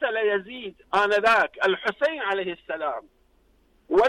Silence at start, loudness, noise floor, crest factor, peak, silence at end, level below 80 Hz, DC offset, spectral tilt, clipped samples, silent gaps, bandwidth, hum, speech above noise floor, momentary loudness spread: 0 s; -24 LUFS; -62 dBFS; 14 dB; -12 dBFS; 0 s; -58 dBFS; under 0.1%; -4 dB/octave; under 0.1%; none; 11.5 kHz; none; 37 dB; 12 LU